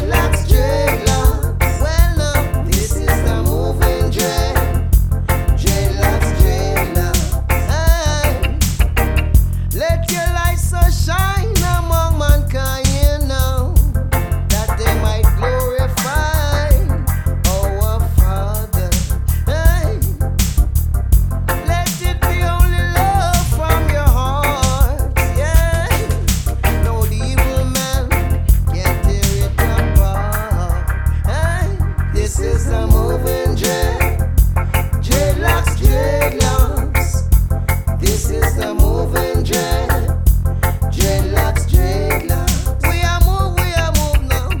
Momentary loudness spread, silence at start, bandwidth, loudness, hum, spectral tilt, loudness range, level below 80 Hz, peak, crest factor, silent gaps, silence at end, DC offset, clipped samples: 3 LU; 0 s; 19.5 kHz; -16 LUFS; none; -5 dB/octave; 1 LU; -16 dBFS; 0 dBFS; 14 dB; none; 0 s; under 0.1%; under 0.1%